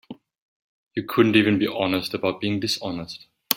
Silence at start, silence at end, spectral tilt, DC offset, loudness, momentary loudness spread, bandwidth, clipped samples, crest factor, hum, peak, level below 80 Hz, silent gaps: 0.1 s; 0 s; -5 dB/octave; under 0.1%; -22 LUFS; 15 LU; 16.5 kHz; under 0.1%; 24 dB; none; 0 dBFS; -62 dBFS; 0.38-0.91 s